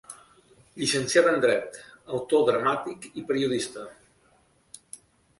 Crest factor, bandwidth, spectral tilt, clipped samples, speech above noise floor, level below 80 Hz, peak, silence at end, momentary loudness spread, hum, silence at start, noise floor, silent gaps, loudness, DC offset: 20 dB; 11.5 kHz; -3.5 dB/octave; under 0.1%; 38 dB; -66 dBFS; -8 dBFS; 1.45 s; 24 LU; none; 0.1 s; -63 dBFS; none; -25 LUFS; under 0.1%